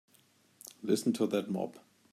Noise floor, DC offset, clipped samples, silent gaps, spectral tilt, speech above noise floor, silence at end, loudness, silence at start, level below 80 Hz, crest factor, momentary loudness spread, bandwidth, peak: -67 dBFS; under 0.1%; under 0.1%; none; -5.5 dB/octave; 35 dB; 0.35 s; -33 LUFS; 0.8 s; -84 dBFS; 20 dB; 18 LU; 16 kHz; -14 dBFS